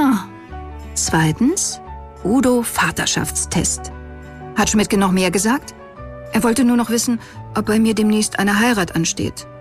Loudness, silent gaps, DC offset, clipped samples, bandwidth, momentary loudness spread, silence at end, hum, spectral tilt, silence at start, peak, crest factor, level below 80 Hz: -17 LUFS; none; under 0.1%; under 0.1%; 15.5 kHz; 18 LU; 0 s; none; -4 dB/octave; 0 s; -4 dBFS; 14 dB; -38 dBFS